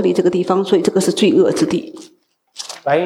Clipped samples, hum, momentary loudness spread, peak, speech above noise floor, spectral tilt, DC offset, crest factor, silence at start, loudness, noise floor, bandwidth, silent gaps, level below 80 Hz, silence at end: under 0.1%; none; 16 LU; -2 dBFS; 21 dB; -5.5 dB/octave; under 0.1%; 14 dB; 0 s; -16 LUFS; -36 dBFS; 15 kHz; none; -60 dBFS; 0 s